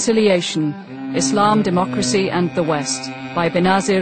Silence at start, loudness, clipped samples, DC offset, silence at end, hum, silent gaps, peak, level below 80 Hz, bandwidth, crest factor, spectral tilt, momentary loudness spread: 0 s; -18 LUFS; under 0.1%; under 0.1%; 0 s; none; none; 0 dBFS; -52 dBFS; 9.2 kHz; 16 dB; -4.5 dB/octave; 9 LU